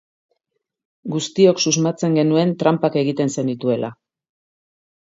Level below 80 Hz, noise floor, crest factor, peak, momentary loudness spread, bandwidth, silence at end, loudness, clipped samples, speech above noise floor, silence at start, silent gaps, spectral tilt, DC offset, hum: -66 dBFS; -77 dBFS; 18 dB; -2 dBFS; 10 LU; 8 kHz; 1.15 s; -18 LUFS; under 0.1%; 59 dB; 1.05 s; none; -5 dB/octave; under 0.1%; none